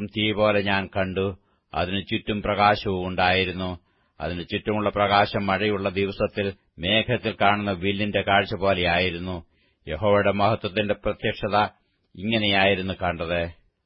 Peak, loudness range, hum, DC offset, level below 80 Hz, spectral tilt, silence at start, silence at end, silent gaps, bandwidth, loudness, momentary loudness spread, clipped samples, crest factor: -4 dBFS; 2 LU; none; under 0.1%; -48 dBFS; -10 dB/octave; 0 s; 0.35 s; none; 5.8 kHz; -23 LUFS; 11 LU; under 0.1%; 20 dB